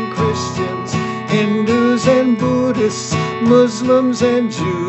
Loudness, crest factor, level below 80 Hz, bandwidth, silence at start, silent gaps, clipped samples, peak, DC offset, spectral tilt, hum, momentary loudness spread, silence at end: -15 LUFS; 14 dB; -54 dBFS; 8.4 kHz; 0 s; none; under 0.1%; 0 dBFS; under 0.1%; -6 dB/octave; none; 8 LU; 0 s